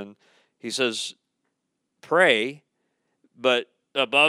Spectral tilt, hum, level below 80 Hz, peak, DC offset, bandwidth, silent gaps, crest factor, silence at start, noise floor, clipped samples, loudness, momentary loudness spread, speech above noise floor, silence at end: -2.5 dB/octave; none; -84 dBFS; -4 dBFS; under 0.1%; 13.5 kHz; none; 22 dB; 0 s; -79 dBFS; under 0.1%; -23 LUFS; 15 LU; 56 dB; 0 s